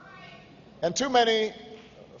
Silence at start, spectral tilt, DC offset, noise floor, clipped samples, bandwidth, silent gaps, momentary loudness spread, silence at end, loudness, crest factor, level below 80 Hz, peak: 0.05 s; -2.5 dB/octave; under 0.1%; -50 dBFS; under 0.1%; 7.6 kHz; none; 25 LU; 0.05 s; -25 LUFS; 18 dB; -64 dBFS; -10 dBFS